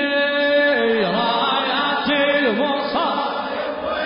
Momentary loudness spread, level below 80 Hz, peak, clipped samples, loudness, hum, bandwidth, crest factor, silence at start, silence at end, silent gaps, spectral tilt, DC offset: 7 LU; -56 dBFS; -8 dBFS; under 0.1%; -19 LUFS; none; 5.4 kHz; 12 dB; 0 s; 0 s; none; -9 dB/octave; under 0.1%